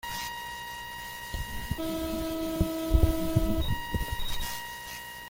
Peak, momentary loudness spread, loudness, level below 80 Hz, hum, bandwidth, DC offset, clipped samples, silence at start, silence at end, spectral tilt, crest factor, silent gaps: -10 dBFS; 11 LU; -32 LUFS; -34 dBFS; 60 Hz at -55 dBFS; 17 kHz; under 0.1%; under 0.1%; 0.05 s; 0 s; -5 dB/octave; 20 dB; none